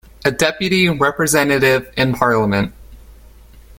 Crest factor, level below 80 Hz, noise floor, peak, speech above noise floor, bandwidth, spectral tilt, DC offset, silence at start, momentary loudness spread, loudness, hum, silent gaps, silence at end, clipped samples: 16 dB; -42 dBFS; -42 dBFS; 0 dBFS; 26 dB; 17 kHz; -4.5 dB/octave; under 0.1%; 0.2 s; 6 LU; -16 LUFS; none; none; 0.2 s; under 0.1%